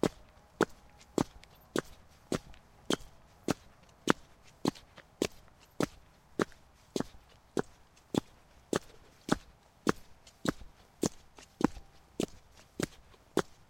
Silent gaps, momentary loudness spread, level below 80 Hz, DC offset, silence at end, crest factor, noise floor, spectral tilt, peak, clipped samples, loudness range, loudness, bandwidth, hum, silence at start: none; 21 LU; -58 dBFS; under 0.1%; 0.3 s; 32 dB; -59 dBFS; -4.5 dB/octave; -6 dBFS; under 0.1%; 2 LU; -37 LUFS; 16.5 kHz; none; 0.05 s